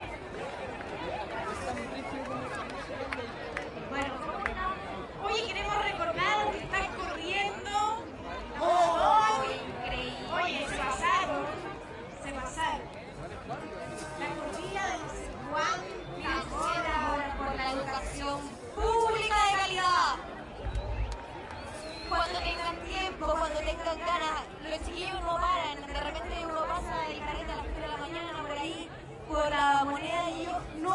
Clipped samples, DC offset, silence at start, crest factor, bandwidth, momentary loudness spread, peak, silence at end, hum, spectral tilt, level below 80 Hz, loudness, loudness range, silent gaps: under 0.1%; under 0.1%; 0 s; 20 dB; 11.5 kHz; 13 LU; -14 dBFS; 0 s; none; -4 dB/octave; -46 dBFS; -32 LUFS; 7 LU; none